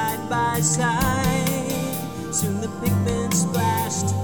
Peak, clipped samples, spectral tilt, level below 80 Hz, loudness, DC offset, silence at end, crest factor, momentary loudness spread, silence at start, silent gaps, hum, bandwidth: -8 dBFS; under 0.1%; -4.5 dB/octave; -40 dBFS; -22 LUFS; 0.5%; 0 s; 14 dB; 6 LU; 0 s; none; none; over 20 kHz